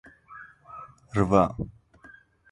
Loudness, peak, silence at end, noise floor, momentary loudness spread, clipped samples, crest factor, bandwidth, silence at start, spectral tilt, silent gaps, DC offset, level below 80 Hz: -25 LUFS; -6 dBFS; 0.8 s; -54 dBFS; 24 LU; under 0.1%; 24 dB; 11 kHz; 0.3 s; -8 dB/octave; none; under 0.1%; -48 dBFS